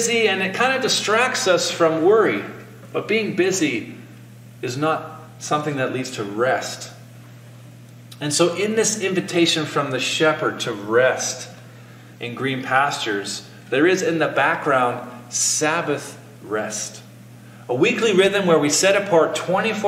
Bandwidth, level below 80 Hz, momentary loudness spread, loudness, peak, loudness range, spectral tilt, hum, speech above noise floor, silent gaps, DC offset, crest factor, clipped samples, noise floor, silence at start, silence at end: 16.5 kHz; -68 dBFS; 15 LU; -20 LUFS; -4 dBFS; 6 LU; -3 dB/octave; 60 Hz at -45 dBFS; 22 dB; none; under 0.1%; 18 dB; under 0.1%; -42 dBFS; 0 s; 0 s